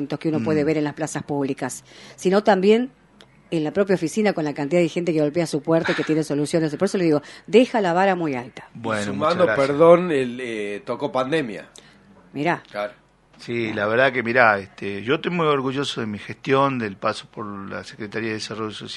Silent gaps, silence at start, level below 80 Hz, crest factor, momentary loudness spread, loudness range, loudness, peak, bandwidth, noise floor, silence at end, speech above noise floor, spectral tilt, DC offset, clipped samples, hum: none; 0 s; -62 dBFS; 22 dB; 14 LU; 5 LU; -21 LUFS; 0 dBFS; 11.5 kHz; -52 dBFS; 0 s; 30 dB; -5.5 dB/octave; under 0.1%; under 0.1%; none